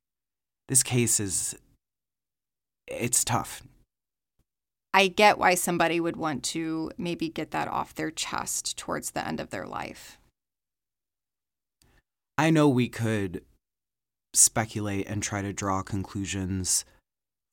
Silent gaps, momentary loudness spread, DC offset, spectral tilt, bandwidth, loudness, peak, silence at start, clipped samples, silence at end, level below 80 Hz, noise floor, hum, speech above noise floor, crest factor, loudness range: none; 15 LU; under 0.1%; -3.5 dB/octave; 17 kHz; -26 LUFS; -4 dBFS; 0.7 s; under 0.1%; 0.7 s; -58 dBFS; under -90 dBFS; none; over 63 dB; 24 dB; 8 LU